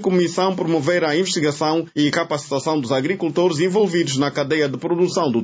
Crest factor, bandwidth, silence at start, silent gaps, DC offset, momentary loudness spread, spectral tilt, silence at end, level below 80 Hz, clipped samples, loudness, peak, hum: 14 dB; 8 kHz; 0 s; none; under 0.1%; 3 LU; -5 dB/octave; 0 s; -62 dBFS; under 0.1%; -19 LUFS; -6 dBFS; none